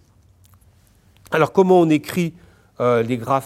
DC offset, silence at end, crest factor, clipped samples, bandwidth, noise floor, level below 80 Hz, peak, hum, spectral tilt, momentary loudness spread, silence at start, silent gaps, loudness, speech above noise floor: under 0.1%; 0 s; 18 dB; under 0.1%; 15.5 kHz; -54 dBFS; -58 dBFS; -2 dBFS; none; -7 dB/octave; 10 LU; 1.3 s; none; -18 LUFS; 37 dB